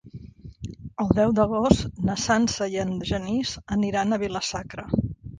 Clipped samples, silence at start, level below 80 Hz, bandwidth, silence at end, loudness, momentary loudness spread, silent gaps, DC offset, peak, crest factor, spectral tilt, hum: under 0.1%; 0.05 s; -42 dBFS; 9.8 kHz; 0 s; -24 LUFS; 16 LU; none; under 0.1%; -2 dBFS; 24 dB; -5.5 dB/octave; none